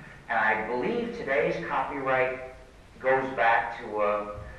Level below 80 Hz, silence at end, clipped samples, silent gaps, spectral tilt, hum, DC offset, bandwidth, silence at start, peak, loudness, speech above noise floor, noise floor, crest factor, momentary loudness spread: -54 dBFS; 0 s; under 0.1%; none; -6 dB/octave; none; under 0.1%; 12 kHz; 0 s; -10 dBFS; -27 LUFS; 22 dB; -49 dBFS; 18 dB; 8 LU